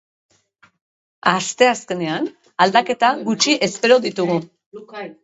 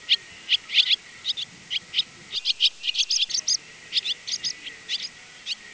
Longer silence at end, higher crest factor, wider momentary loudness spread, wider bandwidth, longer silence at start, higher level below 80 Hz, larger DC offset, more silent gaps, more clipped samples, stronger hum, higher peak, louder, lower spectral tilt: about the same, 0.1 s vs 0 s; about the same, 20 dB vs 22 dB; first, 13 LU vs 10 LU; about the same, 8.2 kHz vs 8 kHz; first, 1.25 s vs 0 s; about the same, -68 dBFS vs -70 dBFS; neither; first, 4.66-4.72 s vs none; neither; neither; first, 0 dBFS vs -6 dBFS; first, -18 LUFS vs -24 LUFS; first, -3.5 dB/octave vs 2.5 dB/octave